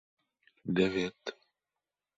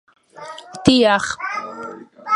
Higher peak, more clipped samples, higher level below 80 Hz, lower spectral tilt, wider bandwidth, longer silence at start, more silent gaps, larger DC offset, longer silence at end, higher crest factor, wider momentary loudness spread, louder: second, -14 dBFS vs 0 dBFS; neither; second, -66 dBFS vs -50 dBFS; first, -6 dB/octave vs -4.5 dB/octave; second, 7.8 kHz vs 11.5 kHz; first, 0.65 s vs 0.35 s; neither; neither; first, 0.85 s vs 0 s; about the same, 22 dB vs 20 dB; second, 15 LU vs 21 LU; second, -32 LUFS vs -17 LUFS